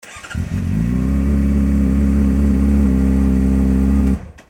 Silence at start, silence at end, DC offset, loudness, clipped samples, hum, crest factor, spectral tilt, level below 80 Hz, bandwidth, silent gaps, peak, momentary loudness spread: 0.05 s; 0.2 s; under 0.1%; -16 LUFS; under 0.1%; none; 12 dB; -8.5 dB/octave; -18 dBFS; 10.5 kHz; none; -4 dBFS; 6 LU